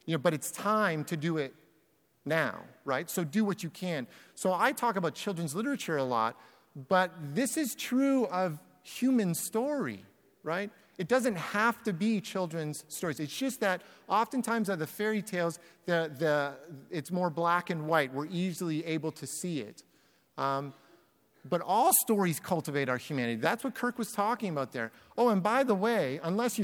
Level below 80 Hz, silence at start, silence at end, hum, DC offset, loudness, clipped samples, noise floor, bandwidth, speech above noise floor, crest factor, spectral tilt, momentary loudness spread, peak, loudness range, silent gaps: -78 dBFS; 0.05 s; 0 s; none; under 0.1%; -31 LUFS; under 0.1%; -70 dBFS; 19.5 kHz; 39 dB; 22 dB; -4.5 dB/octave; 10 LU; -10 dBFS; 3 LU; none